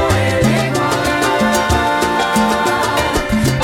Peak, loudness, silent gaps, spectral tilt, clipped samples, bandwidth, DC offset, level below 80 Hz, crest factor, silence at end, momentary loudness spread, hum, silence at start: -2 dBFS; -15 LUFS; none; -4.5 dB/octave; under 0.1%; 17.5 kHz; under 0.1%; -30 dBFS; 12 dB; 0 s; 2 LU; none; 0 s